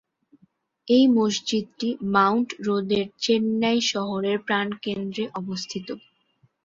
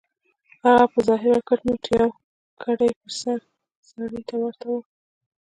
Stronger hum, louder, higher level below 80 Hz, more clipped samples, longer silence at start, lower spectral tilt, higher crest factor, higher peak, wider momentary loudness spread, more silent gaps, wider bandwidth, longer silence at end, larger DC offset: neither; about the same, -23 LUFS vs -22 LUFS; second, -66 dBFS vs -56 dBFS; neither; first, 0.85 s vs 0.65 s; about the same, -4.5 dB/octave vs -5 dB/octave; about the same, 20 dB vs 20 dB; about the same, -4 dBFS vs -4 dBFS; about the same, 12 LU vs 14 LU; second, none vs 2.24-2.57 s, 2.96-3.01 s, 3.76-3.83 s; second, 7.8 kHz vs 10.5 kHz; about the same, 0.65 s vs 0.7 s; neither